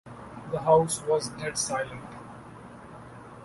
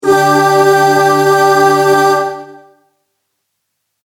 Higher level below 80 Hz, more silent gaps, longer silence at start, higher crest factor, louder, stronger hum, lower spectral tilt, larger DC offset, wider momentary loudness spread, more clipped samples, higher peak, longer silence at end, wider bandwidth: about the same, -58 dBFS vs -58 dBFS; neither; about the same, 0.05 s vs 0.05 s; first, 22 dB vs 12 dB; second, -27 LUFS vs -9 LUFS; neither; about the same, -4 dB/octave vs -4.5 dB/octave; neither; first, 23 LU vs 6 LU; neither; second, -8 dBFS vs 0 dBFS; second, 0 s vs 1.55 s; second, 12 kHz vs 17.5 kHz